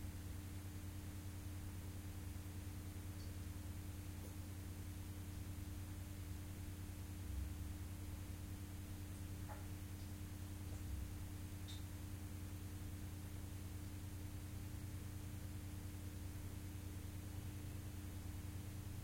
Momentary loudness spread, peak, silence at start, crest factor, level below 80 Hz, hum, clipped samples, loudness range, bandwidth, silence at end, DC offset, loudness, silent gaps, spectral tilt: 1 LU; -36 dBFS; 0 s; 14 dB; -56 dBFS; none; under 0.1%; 1 LU; 16.5 kHz; 0 s; under 0.1%; -51 LUFS; none; -5.5 dB/octave